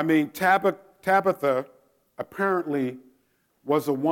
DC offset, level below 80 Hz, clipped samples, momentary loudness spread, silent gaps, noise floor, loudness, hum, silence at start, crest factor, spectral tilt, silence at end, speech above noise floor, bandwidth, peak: under 0.1%; -72 dBFS; under 0.1%; 15 LU; none; -68 dBFS; -24 LUFS; none; 0 s; 18 dB; -6 dB/octave; 0 s; 44 dB; 17 kHz; -8 dBFS